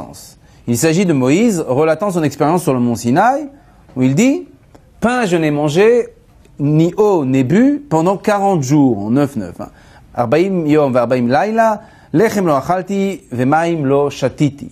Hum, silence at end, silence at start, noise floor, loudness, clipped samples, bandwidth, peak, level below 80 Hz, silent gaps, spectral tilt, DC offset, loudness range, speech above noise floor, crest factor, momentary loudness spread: none; 0.05 s; 0 s; -44 dBFS; -14 LUFS; under 0.1%; 15 kHz; 0 dBFS; -50 dBFS; none; -6.5 dB/octave; under 0.1%; 2 LU; 31 dB; 14 dB; 9 LU